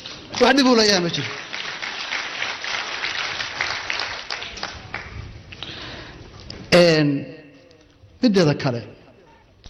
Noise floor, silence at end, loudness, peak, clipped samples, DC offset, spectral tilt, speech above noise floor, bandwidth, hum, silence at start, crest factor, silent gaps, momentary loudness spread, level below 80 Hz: -51 dBFS; 0 s; -20 LUFS; -4 dBFS; under 0.1%; under 0.1%; -4.5 dB/octave; 34 dB; 13.5 kHz; none; 0 s; 18 dB; none; 22 LU; -50 dBFS